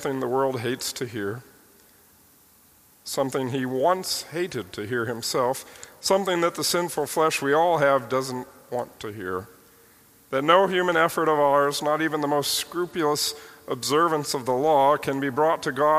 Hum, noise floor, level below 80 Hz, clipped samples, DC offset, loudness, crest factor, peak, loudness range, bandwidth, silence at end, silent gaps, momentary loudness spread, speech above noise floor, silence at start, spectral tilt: none; -56 dBFS; -66 dBFS; under 0.1%; under 0.1%; -24 LUFS; 22 dB; -2 dBFS; 7 LU; 15.5 kHz; 0 s; none; 13 LU; 33 dB; 0 s; -3.5 dB/octave